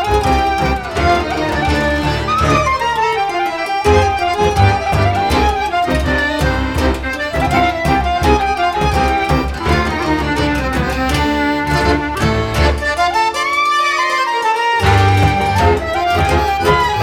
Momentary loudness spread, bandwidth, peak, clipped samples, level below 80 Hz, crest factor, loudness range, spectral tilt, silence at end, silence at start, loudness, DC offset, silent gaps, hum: 4 LU; 17 kHz; 0 dBFS; under 0.1%; -24 dBFS; 14 dB; 2 LU; -5.5 dB/octave; 0 s; 0 s; -14 LUFS; under 0.1%; none; none